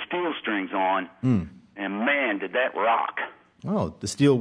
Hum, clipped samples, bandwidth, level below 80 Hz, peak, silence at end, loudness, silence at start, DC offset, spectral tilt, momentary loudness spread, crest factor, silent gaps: none; under 0.1%; 11 kHz; -58 dBFS; -8 dBFS; 0 s; -26 LUFS; 0 s; under 0.1%; -5.5 dB/octave; 10 LU; 18 dB; none